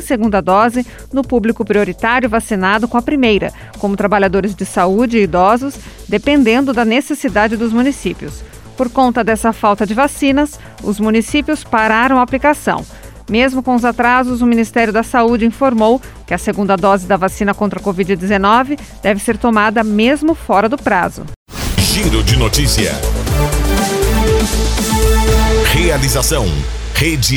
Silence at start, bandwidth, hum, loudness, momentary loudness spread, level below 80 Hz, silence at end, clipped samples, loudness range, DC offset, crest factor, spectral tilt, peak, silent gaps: 0 s; 19.5 kHz; none; -14 LUFS; 8 LU; -24 dBFS; 0 s; under 0.1%; 2 LU; under 0.1%; 14 dB; -5 dB/octave; 0 dBFS; 21.36-21.46 s